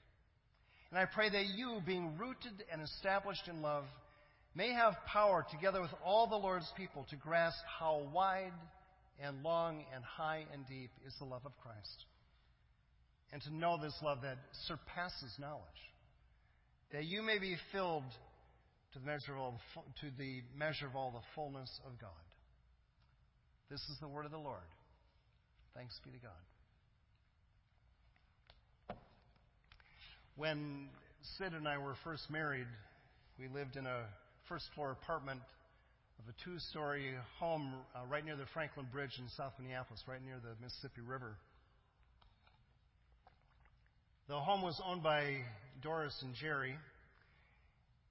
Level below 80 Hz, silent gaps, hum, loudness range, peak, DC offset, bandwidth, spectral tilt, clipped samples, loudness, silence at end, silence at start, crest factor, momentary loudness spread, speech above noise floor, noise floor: -68 dBFS; none; none; 16 LU; -20 dBFS; under 0.1%; 5.6 kHz; -3 dB/octave; under 0.1%; -42 LUFS; 1.05 s; 0.75 s; 24 dB; 19 LU; 32 dB; -74 dBFS